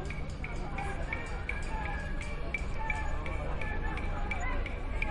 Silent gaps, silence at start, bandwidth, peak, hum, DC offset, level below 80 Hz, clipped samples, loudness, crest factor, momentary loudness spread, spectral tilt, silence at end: none; 0 s; 10.5 kHz; -16 dBFS; none; under 0.1%; -36 dBFS; under 0.1%; -37 LUFS; 16 dB; 4 LU; -6 dB/octave; 0 s